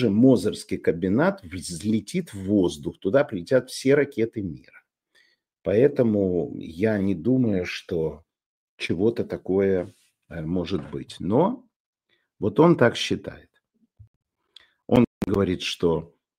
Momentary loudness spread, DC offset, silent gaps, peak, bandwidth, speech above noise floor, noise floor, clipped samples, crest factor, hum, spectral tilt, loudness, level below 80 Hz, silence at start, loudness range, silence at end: 13 LU; under 0.1%; 8.46-8.78 s, 11.76-11.93 s, 14.07-14.21 s, 15.07-15.21 s; -2 dBFS; 15.5 kHz; 46 dB; -69 dBFS; under 0.1%; 22 dB; none; -6.5 dB/octave; -24 LUFS; -54 dBFS; 0 s; 3 LU; 0.35 s